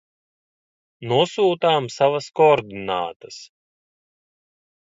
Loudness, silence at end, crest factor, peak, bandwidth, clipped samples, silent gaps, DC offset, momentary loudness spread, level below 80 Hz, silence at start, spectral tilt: -20 LUFS; 1.5 s; 20 dB; -4 dBFS; 7.8 kHz; under 0.1%; 3.16-3.20 s; under 0.1%; 21 LU; -64 dBFS; 1 s; -5 dB/octave